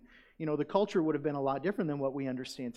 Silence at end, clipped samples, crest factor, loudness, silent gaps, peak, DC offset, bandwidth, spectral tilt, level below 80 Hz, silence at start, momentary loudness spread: 0.05 s; under 0.1%; 20 dB; -33 LUFS; none; -14 dBFS; under 0.1%; 12.5 kHz; -7 dB/octave; -68 dBFS; 0.4 s; 7 LU